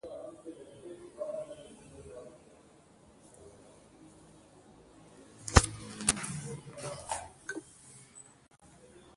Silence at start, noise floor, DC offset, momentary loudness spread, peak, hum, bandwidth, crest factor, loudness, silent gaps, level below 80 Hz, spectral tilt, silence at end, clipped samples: 0.05 s; -60 dBFS; under 0.1%; 28 LU; -2 dBFS; none; 11.5 kHz; 36 dB; -34 LUFS; none; -44 dBFS; -3.5 dB/octave; 0.05 s; under 0.1%